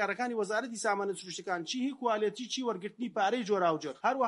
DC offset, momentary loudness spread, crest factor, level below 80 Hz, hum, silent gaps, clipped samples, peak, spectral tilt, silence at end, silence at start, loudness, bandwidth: under 0.1%; 7 LU; 16 dB; -86 dBFS; none; none; under 0.1%; -16 dBFS; -3.5 dB/octave; 0 s; 0 s; -33 LUFS; 11.5 kHz